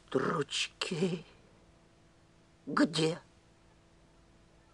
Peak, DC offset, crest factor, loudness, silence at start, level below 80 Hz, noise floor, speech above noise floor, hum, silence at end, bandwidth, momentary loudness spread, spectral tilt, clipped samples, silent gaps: -16 dBFS; under 0.1%; 20 dB; -33 LUFS; 0.1 s; -68 dBFS; -63 dBFS; 31 dB; none; 1.55 s; 12 kHz; 13 LU; -4.5 dB/octave; under 0.1%; none